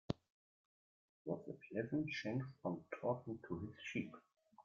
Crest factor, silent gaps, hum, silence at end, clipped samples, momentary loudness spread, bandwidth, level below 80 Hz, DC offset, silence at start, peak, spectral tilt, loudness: 24 dB; 0.30-1.25 s; none; 0.05 s; under 0.1%; 7 LU; 7.4 kHz; -76 dBFS; under 0.1%; 0.1 s; -22 dBFS; -5.5 dB/octave; -45 LUFS